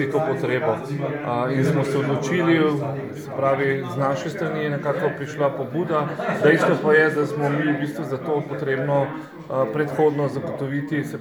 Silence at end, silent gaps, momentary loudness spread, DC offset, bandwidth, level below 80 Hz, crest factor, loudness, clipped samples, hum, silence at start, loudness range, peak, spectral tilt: 0 s; none; 9 LU; under 0.1%; 20 kHz; -66 dBFS; 18 dB; -22 LUFS; under 0.1%; none; 0 s; 3 LU; -4 dBFS; -7 dB/octave